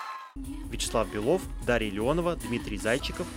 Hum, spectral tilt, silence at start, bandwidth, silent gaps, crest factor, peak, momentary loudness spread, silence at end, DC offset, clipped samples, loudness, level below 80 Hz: none; -4.5 dB/octave; 0 s; 16.5 kHz; none; 18 dB; -12 dBFS; 12 LU; 0 s; under 0.1%; under 0.1%; -29 LUFS; -40 dBFS